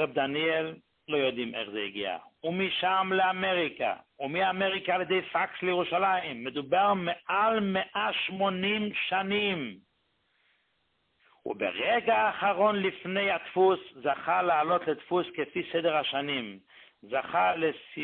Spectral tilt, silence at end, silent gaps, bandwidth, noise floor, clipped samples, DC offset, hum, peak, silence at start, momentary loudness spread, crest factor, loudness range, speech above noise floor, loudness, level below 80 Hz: -9 dB/octave; 0 s; none; 4.4 kHz; -74 dBFS; under 0.1%; under 0.1%; none; -12 dBFS; 0 s; 9 LU; 16 dB; 4 LU; 46 dB; -28 LUFS; -70 dBFS